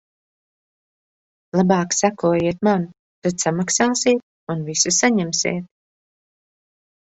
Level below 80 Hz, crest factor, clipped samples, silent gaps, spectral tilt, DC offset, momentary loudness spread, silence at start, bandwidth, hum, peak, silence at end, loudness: -58 dBFS; 20 dB; under 0.1%; 2.99-3.22 s, 4.23-4.47 s; -4 dB/octave; under 0.1%; 9 LU; 1.55 s; 8.2 kHz; none; -2 dBFS; 1.35 s; -19 LUFS